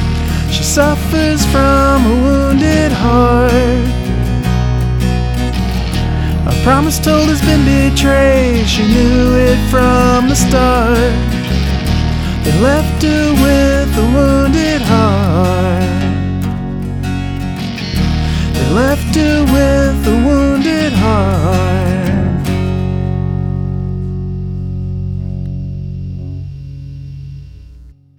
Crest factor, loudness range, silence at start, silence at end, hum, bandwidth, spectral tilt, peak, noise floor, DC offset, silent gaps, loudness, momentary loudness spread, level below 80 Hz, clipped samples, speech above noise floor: 12 dB; 8 LU; 0 s; 0.3 s; none; 19 kHz; -6 dB/octave; 0 dBFS; -37 dBFS; under 0.1%; none; -12 LUFS; 11 LU; -18 dBFS; under 0.1%; 28 dB